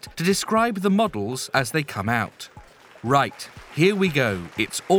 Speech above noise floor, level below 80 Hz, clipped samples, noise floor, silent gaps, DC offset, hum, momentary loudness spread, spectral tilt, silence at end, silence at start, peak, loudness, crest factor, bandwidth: 25 dB; -54 dBFS; under 0.1%; -47 dBFS; none; under 0.1%; none; 13 LU; -5 dB/octave; 0 s; 0.05 s; -4 dBFS; -22 LUFS; 20 dB; 19 kHz